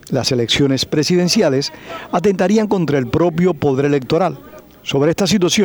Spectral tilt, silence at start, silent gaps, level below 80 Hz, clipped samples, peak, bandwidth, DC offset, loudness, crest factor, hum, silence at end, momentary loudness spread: -5 dB/octave; 0.05 s; none; -46 dBFS; under 0.1%; -2 dBFS; over 20 kHz; under 0.1%; -16 LUFS; 14 dB; none; 0 s; 7 LU